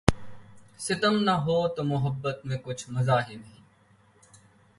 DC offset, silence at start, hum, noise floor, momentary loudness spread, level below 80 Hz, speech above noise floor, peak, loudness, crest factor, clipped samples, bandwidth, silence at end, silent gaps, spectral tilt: under 0.1%; 0.05 s; none; -61 dBFS; 13 LU; -46 dBFS; 34 dB; 0 dBFS; -27 LUFS; 28 dB; under 0.1%; 11.5 kHz; 1.3 s; none; -5.5 dB/octave